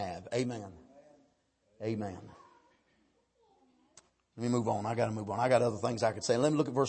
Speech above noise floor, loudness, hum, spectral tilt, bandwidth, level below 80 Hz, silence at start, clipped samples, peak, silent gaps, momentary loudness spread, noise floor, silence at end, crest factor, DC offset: 42 dB; -32 LUFS; none; -6 dB/octave; 8.8 kHz; -70 dBFS; 0 s; under 0.1%; -14 dBFS; none; 13 LU; -73 dBFS; 0 s; 20 dB; under 0.1%